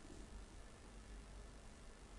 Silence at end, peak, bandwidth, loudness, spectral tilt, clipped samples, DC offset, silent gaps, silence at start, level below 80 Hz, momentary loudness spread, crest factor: 0 s; -42 dBFS; 11.5 kHz; -59 LUFS; -4.5 dB/octave; under 0.1%; under 0.1%; none; 0 s; -58 dBFS; 3 LU; 14 dB